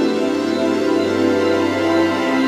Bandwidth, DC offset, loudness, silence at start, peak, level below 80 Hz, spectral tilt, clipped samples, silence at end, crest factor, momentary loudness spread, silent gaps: 14 kHz; under 0.1%; -17 LUFS; 0 s; -4 dBFS; -64 dBFS; -5 dB/octave; under 0.1%; 0 s; 12 dB; 2 LU; none